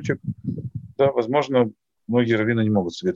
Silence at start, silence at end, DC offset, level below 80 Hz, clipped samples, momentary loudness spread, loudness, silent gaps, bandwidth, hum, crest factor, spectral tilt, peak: 0 s; 0 s; under 0.1%; -58 dBFS; under 0.1%; 11 LU; -22 LUFS; none; 7.6 kHz; none; 16 dB; -7.5 dB/octave; -6 dBFS